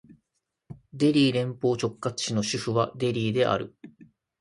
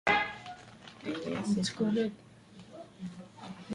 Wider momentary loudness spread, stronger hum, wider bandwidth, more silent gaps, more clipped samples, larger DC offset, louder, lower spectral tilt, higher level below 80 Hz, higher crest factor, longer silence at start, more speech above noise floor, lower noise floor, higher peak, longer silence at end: second, 8 LU vs 21 LU; neither; about the same, 11.5 kHz vs 11.5 kHz; neither; neither; neither; first, -26 LUFS vs -34 LUFS; about the same, -5.5 dB/octave vs -5 dB/octave; about the same, -62 dBFS vs -64 dBFS; about the same, 18 dB vs 20 dB; first, 0.7 s vs 0.05 s; first, 55 dB vs 20 dB; first, -80 dBFS vs -54 dBFS; first, -8 dBFS vs -14 dBFS; first, 0.5 s vs 0 s